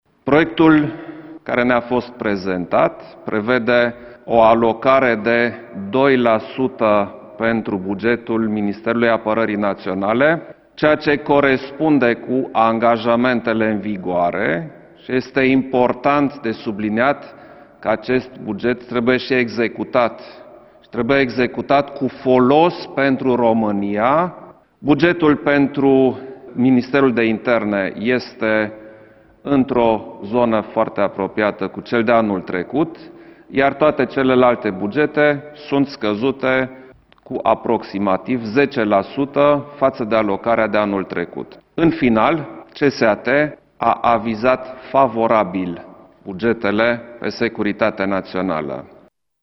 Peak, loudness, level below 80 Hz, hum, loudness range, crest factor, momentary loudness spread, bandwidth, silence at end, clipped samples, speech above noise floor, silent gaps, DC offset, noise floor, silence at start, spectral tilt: 0 dBFS; -17 LUFS; -50 dBFS; none; 3 LU; 18 dB; 9 LU; 6 kHz; 0.55 s; under 0.1%; 29 dB; none; under 0.1%; -46 dBFS; 0.25 s; -8 dB/octave